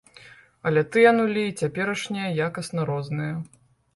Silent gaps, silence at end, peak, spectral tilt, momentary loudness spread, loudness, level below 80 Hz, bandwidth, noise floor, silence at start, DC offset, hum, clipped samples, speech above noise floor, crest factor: none; 0.5 s; -4 dBFS; -6 dB/octave; 13 LU; -24 LUFS; -62 dBFS; 11.5 kHz; -50 dBFS; 0.25 s; under 0.1%; none; under 0.1%; 27 dB; 20 dB